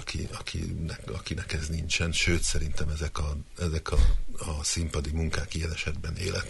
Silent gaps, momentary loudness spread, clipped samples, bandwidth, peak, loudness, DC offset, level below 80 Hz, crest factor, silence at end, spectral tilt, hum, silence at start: none; 9 LU; under 0.1%; 11.5 kHz; -10 dBFS; -30 LUFS; under 0.1%; -32 dBFS; 18 dB; 0 s; -4 dB/octave; none; 0 s